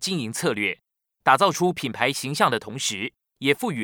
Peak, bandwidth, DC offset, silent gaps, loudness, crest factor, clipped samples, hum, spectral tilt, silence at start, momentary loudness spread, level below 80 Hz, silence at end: -2 dBFS; over 20 kHz; under 0.1%; none; -23 LUFS; 22 dB; under 0.1%; none; -3.5 dB/octave; 0 s; 8 LU; -68 dBFS; 0 s